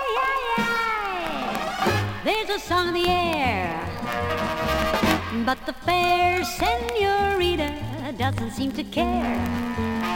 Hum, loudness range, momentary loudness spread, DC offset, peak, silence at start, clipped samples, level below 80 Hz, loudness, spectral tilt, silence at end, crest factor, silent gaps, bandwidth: none; 2 LU; 6 LU; under 0.1%; -6 dBFS; 0 s; under 0.1%; -42 dBFS; -24 LUFS; -5 dB/octave; 0 s; 18 dB; none; 17 kHz